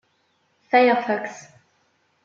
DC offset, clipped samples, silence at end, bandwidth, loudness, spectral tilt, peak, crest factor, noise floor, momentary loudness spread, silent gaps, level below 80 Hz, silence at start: under 0.1%; under 0.1%; 0.85 s; 7.4 kHz; -20 LUFS; -4.5 dB/octave; -4 dBFS; 20 dB; -67 dBFS; 19 LU; none; -80 dBFS; 0.7 s